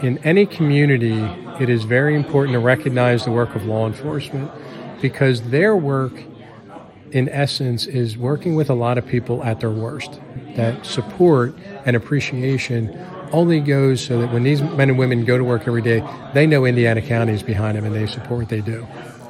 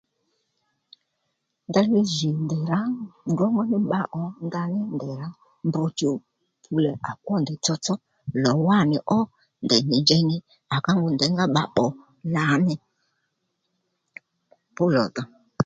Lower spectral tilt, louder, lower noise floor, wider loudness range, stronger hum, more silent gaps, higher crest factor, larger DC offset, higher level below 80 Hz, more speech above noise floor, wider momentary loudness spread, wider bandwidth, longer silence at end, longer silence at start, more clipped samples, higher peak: first, -7 dB/octave vs -5.5 dB/octave; first, -19 LUFS vs -24 LUFS; second, -39 dBFS vs -77 dBFS; about the same, 4 LU vs 6 LU; neither; neither; about the same, 18 dB vs 20 dB; neither; first, -54 dBFS vs -62 dBFS; second, 21 dB vs 54 dB; about the same, 11 LU vs 12 LU; first, 12.5 kHz vs 9.2 kHz; about the same, 0 s vs 0 s; second, 0 s vs 1.7 s; neither; first, 0 dBFS vs -4 dBFS